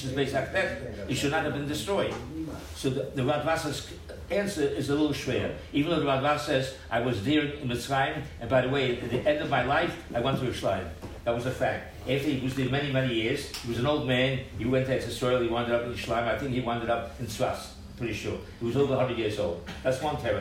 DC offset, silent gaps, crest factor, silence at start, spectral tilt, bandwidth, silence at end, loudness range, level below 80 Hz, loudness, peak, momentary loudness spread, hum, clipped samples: under 0.1%; none; 16 dB; 0 s; -5.5 dB/octave; 16 kHz; 0 s; 3 LU; -48 dBFS; -29 LUFS; -12 dBFS; 8 LU; none; under 0.1%